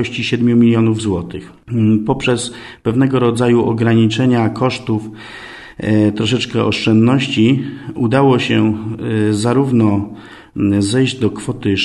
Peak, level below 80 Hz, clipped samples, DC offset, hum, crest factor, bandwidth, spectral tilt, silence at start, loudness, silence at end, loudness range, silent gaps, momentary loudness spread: 0 dBFS; -46 dBFS; under 0.1%; under 0.1%; none; 14 dB; 11.5 kHz; -6.5 dB/octave; 0 s; -15 LUFS; 0 s; 2 LU; none; 13 LU